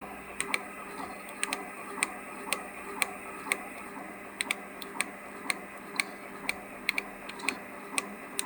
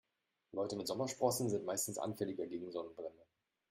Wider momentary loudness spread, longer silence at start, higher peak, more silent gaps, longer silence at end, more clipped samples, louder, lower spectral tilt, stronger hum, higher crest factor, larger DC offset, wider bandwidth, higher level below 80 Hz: second, 9 LU vs 12 LU; second, 0 s vs 0.55 s; first, -6 dBFS vs -20 dBFS; neither; second, 0 s vs 0.5 s; neither; first, -35 LUFS vs -40 LUFS; second, -1 dB/octave vs -4.5 dB/octave; neither; first, 30 dB vs 22 dB; neither; first, over 20 kHz vs 16 kHz; first, -68 dBFS vs -78 dBFS